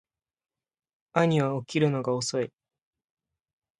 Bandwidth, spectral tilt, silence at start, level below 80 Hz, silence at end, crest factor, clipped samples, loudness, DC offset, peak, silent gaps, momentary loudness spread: 11.5 kHz; -5.5 dB/octave; 1.15 s; -70 dBFS; 1.3 s; 26 dB; under 0.1%; -27 LUFS; under 0.1%; -4 dBFS; none; 7 LU